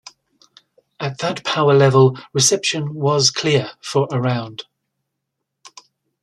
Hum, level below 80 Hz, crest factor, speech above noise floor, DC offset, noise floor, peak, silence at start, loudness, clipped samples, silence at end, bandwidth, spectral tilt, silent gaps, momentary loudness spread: none; -60 dBFS; 18 dB; 61 dB; under 0.1%; -78 dBFS; -2 dBFS; 1 s; -17 LUFS; under 0.1%; 0.55 s; 13.5 kHz; -4 dB/octave; none; 13 LU